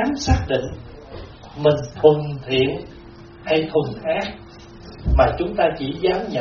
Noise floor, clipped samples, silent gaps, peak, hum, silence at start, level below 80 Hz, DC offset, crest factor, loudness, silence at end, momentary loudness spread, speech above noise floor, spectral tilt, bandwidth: -41 dBFS; under 0.1%; none; 0 dBFS; none; 0 s; -32 dBFS; under 0.1%; 20 dB; -20 LUFS; 0 s; 22 LU; 21 dB; -5 dB/octave; 6.8 kHz